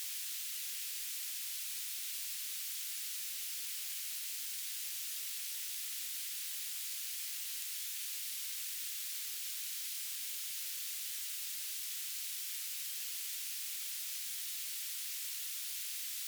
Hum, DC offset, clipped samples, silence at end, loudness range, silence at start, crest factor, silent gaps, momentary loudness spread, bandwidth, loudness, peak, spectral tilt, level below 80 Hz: none; under 0.1%; under 0.1%; 0 s; 0 LU; 0 s; 20 dB; none; 0 LU; over 20 kHz; -38 LUFS; -22 dBFS; 10 dB/octave; under -90 dBFS